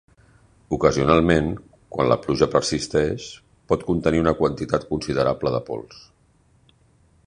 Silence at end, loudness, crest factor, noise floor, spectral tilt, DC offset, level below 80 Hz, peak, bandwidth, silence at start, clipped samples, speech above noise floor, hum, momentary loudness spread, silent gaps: 1.3 s; -21 LUFS; 20 dB; -59 dBFS; -6 dB/octave; under 0.1%; -42 dBFS; -2 dBFS; 10.5 kHz; 0.7 s; under 0.1%; 38 dB; none; 15 LU; none